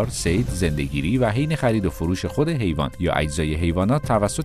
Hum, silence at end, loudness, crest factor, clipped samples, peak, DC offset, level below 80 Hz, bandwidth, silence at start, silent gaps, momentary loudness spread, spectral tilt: none; 0 s; -22 LUFS; 16 dB; under 0.1%; -6 dBFS; under 0.1%; -34 dBFS; 14 kHz; 0 s; none; 4 LU; -6 dB/octave